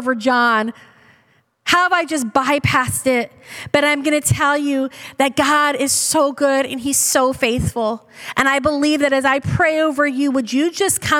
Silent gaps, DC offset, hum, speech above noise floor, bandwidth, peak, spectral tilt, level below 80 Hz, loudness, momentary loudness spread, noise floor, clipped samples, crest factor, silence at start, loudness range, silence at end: none; under 0.1%; none; 41 dB; 18 kHz; -2 dBFS; -3.5 dB/octave; -46 dBFS; -17 LUFS; 6 LU; -58 dBFS; under 0.1%; 16 dB; 0 s; 1 LU; 0 s